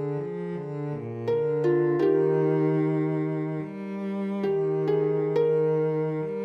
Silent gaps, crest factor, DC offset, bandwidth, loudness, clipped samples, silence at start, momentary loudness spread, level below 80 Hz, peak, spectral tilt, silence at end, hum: none; 12 dB; under 0.1%; 6.2 kHz; -26 LUFS; under 0.1%; 0 s; 10 LU; -70 dBFS; -12 dBFS; -10 dB/octave; 0 s; none